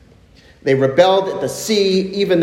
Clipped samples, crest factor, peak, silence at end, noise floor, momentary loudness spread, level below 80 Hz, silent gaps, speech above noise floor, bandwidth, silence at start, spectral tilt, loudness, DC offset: under 0.1%; 16 dB; 0 dBFS; 0 s; -47 dBFS; 9 LU; -54 dBFS; none; 32 dB; 16.5 kHz; 0.65 s; -5 dB/octave; -16 LUFS; under 0.1%